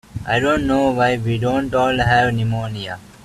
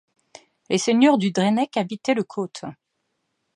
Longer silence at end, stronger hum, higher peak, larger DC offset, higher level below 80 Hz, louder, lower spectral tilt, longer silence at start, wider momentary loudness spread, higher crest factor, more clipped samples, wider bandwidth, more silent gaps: second, 0.2 s vs 0.85 s; neither; first, -2 dBFS vs -6 dBFS; neither; first, -40 dBFS vs -72 dBFS; first, -18 LUFS vs -21 LUFS; first, -6.5 dB/octave vs -5 dB/octave; second, 0.15 s vs 0.7 s; second, 9 LU vs 14 LU; about the same, 16 dB vs 18 dB; neither; first, 13 kHz vs 11 kHz; neither